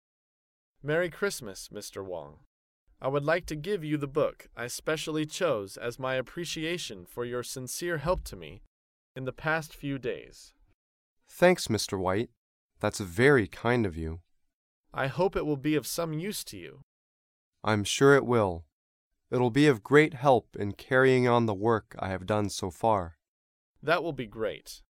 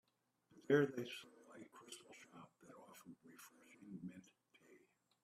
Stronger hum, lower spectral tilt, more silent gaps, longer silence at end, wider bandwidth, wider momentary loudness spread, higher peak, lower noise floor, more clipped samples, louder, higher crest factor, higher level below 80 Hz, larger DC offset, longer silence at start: neither; about the same, -5 dB/octave vs -5.5 dB/octave; first, 2.46-2.87 s, 8.67-9.15 s, 10.74-11.17 s, 12.37-12.69 s, 14.53-14.84 s, 16.83-17.53 s, 18.72-19.11 s, 23.28-23.75 s vs none; second, 0.2 s vs 1.05 s; first, 16.5 kHz vs 14.5 kHz; second, 17 LU vs 26 LU; first, -6 dBFS vs -22 dBFS; first, under -90 dBFS vs -79 dBFS; neither; first, -28 LUFS vs -42 LUFS; about the same, 22 dB vs 26 dB; first, -54 dBFS vs -88 dBFS; neither; first, 0.85 s vs 0.7 s